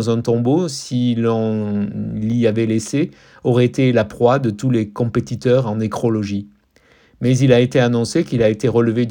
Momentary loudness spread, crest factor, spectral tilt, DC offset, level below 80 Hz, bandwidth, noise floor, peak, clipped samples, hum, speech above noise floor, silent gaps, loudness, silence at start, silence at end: 7 LU; 16 dB; -7 dB/octave; under 0.1%; -50 dBFS; 15.5 kHz; -54 dBFS; 0 dBFS; under 0.1%; none; 37 dB; none; -18 LUFS; 0 s; 0 s